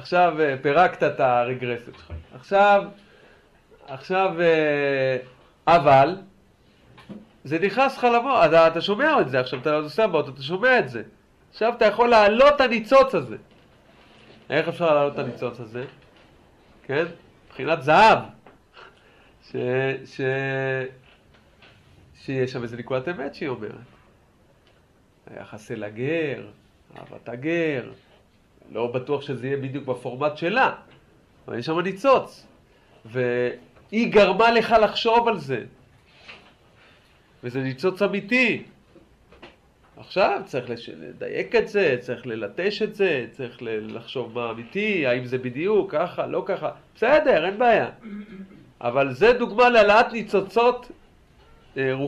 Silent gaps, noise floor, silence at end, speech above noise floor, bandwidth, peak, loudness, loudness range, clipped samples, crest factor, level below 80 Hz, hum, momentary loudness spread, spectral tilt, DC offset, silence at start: none; -58 dBFS; 0 s; 37 dB; 11.5 kHz; -6 dBFS; -22 LUFS; 10 LU; under 0.1%; 18 dB; -56 dBFS; none; 19 LU; -6 dB/octave; under 0.1%; 0 s